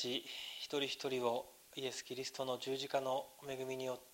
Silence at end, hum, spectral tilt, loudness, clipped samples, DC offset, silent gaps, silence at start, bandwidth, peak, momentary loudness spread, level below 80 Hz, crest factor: 0 s; none; -3 dB/octave; -41 LUFS; under 0.1%; under 0.1%; none; 0 s; 16 kHz; -24 dBFS; 7 LU; -82 dBFS; 18 dB